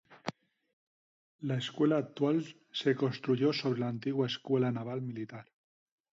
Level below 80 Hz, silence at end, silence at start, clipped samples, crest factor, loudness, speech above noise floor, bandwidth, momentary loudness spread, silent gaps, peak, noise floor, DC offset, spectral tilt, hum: -78 dBFS; 0.75 s; 0.1 s; under 0.1%; 18 dB; -33 LUFS; over 58 dB; 7.8 kHz; 13 LU; 0.73-1.39 s; -16 dBFS; under -90 dBFS; under 0.1%; -7 dB/octave; none